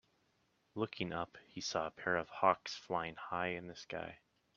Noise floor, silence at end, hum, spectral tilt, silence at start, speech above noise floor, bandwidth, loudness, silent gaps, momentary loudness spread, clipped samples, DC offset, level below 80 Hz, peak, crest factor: -77 dBFS; 0.4 s; none; -4 dB/octave; 0.75 s; 38 dB; 7.6 kHz; -39 LUFS; none; 13 LU; under 0.1%; under 0.1%; -74 dBFS; -14 dBFS; 26 dB